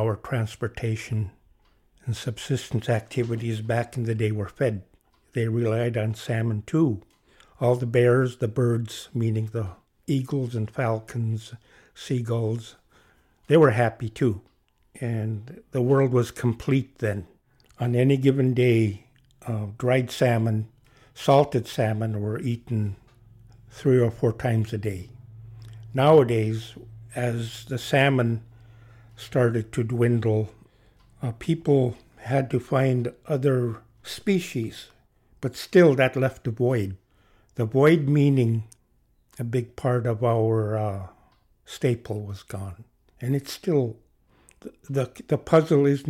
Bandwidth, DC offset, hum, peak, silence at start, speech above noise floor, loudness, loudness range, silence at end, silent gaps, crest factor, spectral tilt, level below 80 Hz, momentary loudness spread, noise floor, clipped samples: 15 kHz; under 0.1%; none; -6 dBFS; 0 s; 41 dB; -25 LUFS; 6 LU; 0 s; none; 18 dB; -7.5 dB/octave; -56 dBFS; 16 LU; -64 dBFS; under 0.1%